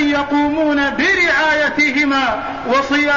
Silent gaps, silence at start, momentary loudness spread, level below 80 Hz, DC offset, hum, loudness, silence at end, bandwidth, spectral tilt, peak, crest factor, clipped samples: none; 0 s; 5 LU; -44 dBFS; 0.4%; none; -15 LUFS; 0 s; 7.4 kHz; -3.5 dB/octave; -4 dBFS; 10 dB; under 0.1%